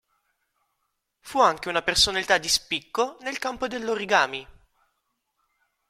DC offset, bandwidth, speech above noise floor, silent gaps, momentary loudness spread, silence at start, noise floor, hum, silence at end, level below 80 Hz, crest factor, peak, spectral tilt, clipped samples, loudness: under 0.1%; 16.5 kHz; 53 dB; none; 10 LU; 1.25 s; -77 dBFS; none; 1.4 s; -54 dBFS; 22 dB; -4 dBFS; -1.5 dB/octave; under 0.1%; -23 LUFS